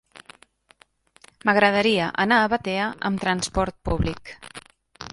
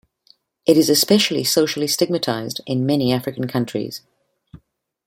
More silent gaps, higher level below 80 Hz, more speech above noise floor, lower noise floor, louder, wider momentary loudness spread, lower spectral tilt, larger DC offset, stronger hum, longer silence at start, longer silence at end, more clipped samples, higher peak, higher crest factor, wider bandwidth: neither; first, -42 dBFS vs -58 dBFS; second, 36 dB vs 41 dB; about the same, -58 dBFS vs -59 dBFS; second, -22 LUFS vs -18 LUFS; first, 22 LU vs 11 LU; about the same, -4.5 dB/octave vs -4 dB/octave; neither; neither; first, 1.45 s vs 0.65 s; second, 0.05 s vs 0.5 s; neither; about the same, -4 dBFS vs -2 dBFS; about the same, 20 dB vs 18 dB; second, 11.5 kHz vs 16.5 kHz